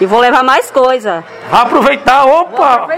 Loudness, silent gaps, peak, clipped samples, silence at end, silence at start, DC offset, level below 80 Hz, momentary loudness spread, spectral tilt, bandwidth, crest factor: -9 LUFS; none; 0 dBFS; 1%; 0 s; 0 s; under 0.1%; -44 dBFS; 6 LU; -4 dB/octave; 16 kHz; 10 dB